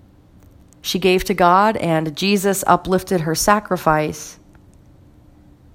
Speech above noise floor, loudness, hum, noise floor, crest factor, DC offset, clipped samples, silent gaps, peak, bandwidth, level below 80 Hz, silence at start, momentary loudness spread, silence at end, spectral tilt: 31 dB; -17 LUFS; none; -48 dBFS; 20 dB; under 0.1%; under 0.1%; none; 0 dBFS; 16.5 kHz; -44 dBFS; 0.85 s; 10 LU; 1.4 s; -4.5 dB/octave